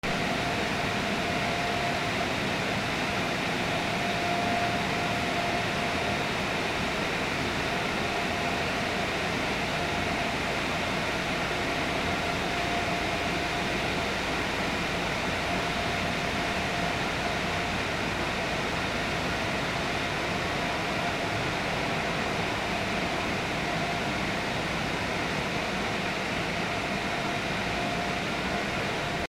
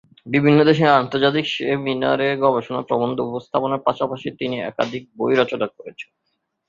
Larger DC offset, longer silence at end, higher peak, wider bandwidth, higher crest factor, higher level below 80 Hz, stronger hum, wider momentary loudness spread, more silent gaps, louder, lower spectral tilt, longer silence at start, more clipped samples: neither; second, 0.05 s vs 0.65 s; second, -16 dBFS vs -2 dBFS; first, 16 kHz vs 7.4 kHz; about the same, 14 dB vs 18 dB; first, -46 dBFS vs -60 dBFS; neither; second, 1 LU vs 12 LU; neither; second, -28 LUFS vs -20 LUFS; second, -4 dB/octave vs -7 dB/octave; second, 0.05 s vs 0.25 s; neither